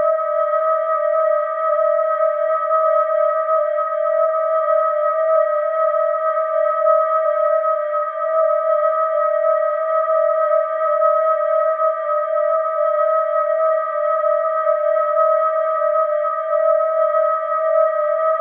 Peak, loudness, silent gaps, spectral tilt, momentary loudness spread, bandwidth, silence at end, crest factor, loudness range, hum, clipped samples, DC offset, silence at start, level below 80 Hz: -4 dBFS; -18 LUFS; none; -3 dB/octave; 3 LU; 3.4 kHz; 0 s; 12 dB; 1 LU; none; under 0.1%; under 0.1%; 0 s; under -90 dBFS